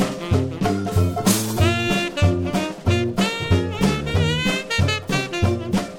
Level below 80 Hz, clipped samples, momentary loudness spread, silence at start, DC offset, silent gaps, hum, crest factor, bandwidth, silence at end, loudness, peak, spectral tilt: -36 dBFS; under 0.1%; 3 LU; 0 s; under 0.1%; none; none; 16 dB; 17.5 kHz; 0 s; -21 LUFS; -4 dBFS; -5 dB/octave